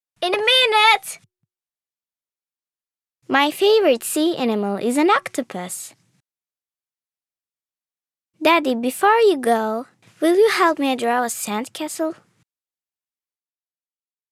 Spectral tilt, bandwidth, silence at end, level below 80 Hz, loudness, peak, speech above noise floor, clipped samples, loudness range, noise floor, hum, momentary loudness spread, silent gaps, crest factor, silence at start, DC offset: -2.5 dB/octave; 16 kHz; 2.2 s; -74 dBFS; -18 LUFS; -2 dBFS; over 71 dB; under 0.1%; 8 LU; under -90 dBFS; none; 14 LU; none; 18 dB; 0.2 s; under 0.1%